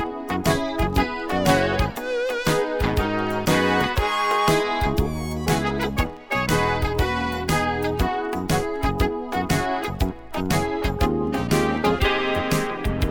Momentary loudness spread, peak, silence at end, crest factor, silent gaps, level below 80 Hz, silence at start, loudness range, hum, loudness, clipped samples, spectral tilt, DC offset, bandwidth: 5 LU; -4 dBFS; 0 s; 18 dB; none; -32 dBFS; 0 s; 2 LU; none; -23 LUFS; under 0.1%; -5 dB/octave; under 0.1%; 18 kHz